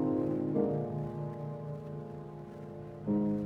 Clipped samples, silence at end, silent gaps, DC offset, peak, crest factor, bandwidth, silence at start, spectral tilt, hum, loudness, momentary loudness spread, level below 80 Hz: under 0.1%; 0 s; none; under 0.1%; -18 dBFS; 18 dB; 5 kHz; 0 s; -11 dB/octave; none; -36 LUFS; 14 LU; -62 dBFS